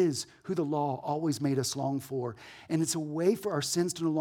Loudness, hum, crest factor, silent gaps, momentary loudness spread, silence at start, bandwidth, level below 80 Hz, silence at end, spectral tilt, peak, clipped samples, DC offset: -31 LUFS; none; 16 dB; none; 7 LU; 0 s; 19 kHz; -72 dBFS; 0 s; -5 dB/octave; -14 dBFS; under 0.1%; under 0.1%